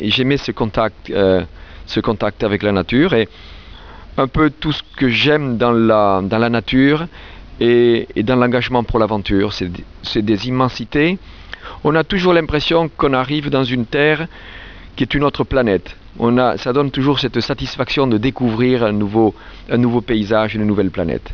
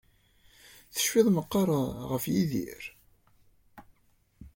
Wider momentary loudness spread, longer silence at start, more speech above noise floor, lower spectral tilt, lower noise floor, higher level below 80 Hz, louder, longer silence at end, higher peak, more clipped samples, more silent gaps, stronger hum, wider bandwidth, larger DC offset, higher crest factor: second, 9 LU vs 15 LU; second, 0 s vs 0.95 s; second, 20 dB vs 40 dB; first, -7 dB/octave vs -5 dB/octave; second, -36 dBFS vs -67 dBFS; first, -36 dBFS vs -58 dBFS; first, -16 LUFS vs -28 LUFS; about the same, 0 s vs 0.05 s; first, 0 dBFS vs -10 dBFS; neither; neither; neither; second, 5.4 kHz vs 17 kHz; first, 0.5% vs under 0.1%; about the same, 16 dB vs 20 dB